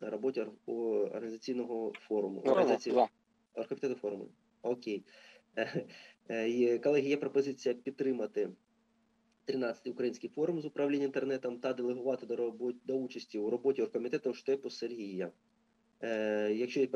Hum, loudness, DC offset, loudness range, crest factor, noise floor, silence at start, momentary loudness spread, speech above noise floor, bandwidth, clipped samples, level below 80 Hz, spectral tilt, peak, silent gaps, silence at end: none; -35 LUFS; under 0.1%; 4 LU; 22 dB; -74 dBFS; 0 s; 11 LU; 39 dB; 8 kHz; under 0.1%; under -90 dBFS; -6 dB/octave; -14 dBFS; none; 0 s